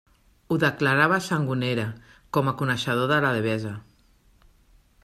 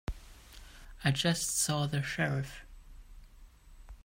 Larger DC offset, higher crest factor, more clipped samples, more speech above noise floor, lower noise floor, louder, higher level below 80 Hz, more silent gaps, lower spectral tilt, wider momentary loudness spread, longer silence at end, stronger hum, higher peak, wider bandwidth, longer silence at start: neither; about the same, 20 dB vs 20 dB; neither; first, 36 dB vs 23 dB; first, -59 dBFS vs -55 dBFS; first, -24 LUFS vs -32 LUFS; second, -60 dBFS vs -50 dBFS; neither; first, -6 dB/octave vs -3.5 dB/octave; second, 9 LU vs 24 LU; first, 1.25 s vs 0.05 s; neither; first, -6 dBFS vs -14 dBFS; second, 14.5 kHz vs 16 kHz; first, 0.5 s vs 0.1 s